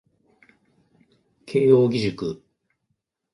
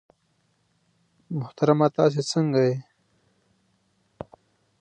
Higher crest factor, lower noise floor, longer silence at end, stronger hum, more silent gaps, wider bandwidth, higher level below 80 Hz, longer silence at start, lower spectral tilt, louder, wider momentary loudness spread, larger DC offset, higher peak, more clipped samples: about the same, 20 dB vs 22 dB; first, -76 dBFS vs -69 dBFS; second, 1 s vs 2 s; neither; neither; about the same, 10.5 kHz vs 9.8 kHz; first, -62 dBFS vs -68 dBFS; first, 1.5 s vs 1.3 s; about the same, -7.5 dB/octave vs -6.5 dB/octave; about the same, -21 LUFS vs -23 LUFS; second, 15 LU vs 23 LU; neither; about the same, -4 dBFS vs -4 dBFS; neither